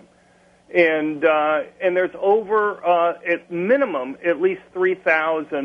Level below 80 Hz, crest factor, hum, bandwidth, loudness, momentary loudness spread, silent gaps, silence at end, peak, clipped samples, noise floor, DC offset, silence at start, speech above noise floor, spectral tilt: -68 dBFS; 18 dB; none; 6.4 kHz; -20 LUFS; 6 LU; none; 0 s; -2 dBFS; under 0.1%; -55 dBFS; under 0.1%; 0.7 s; 35 dB; -7 dB/octave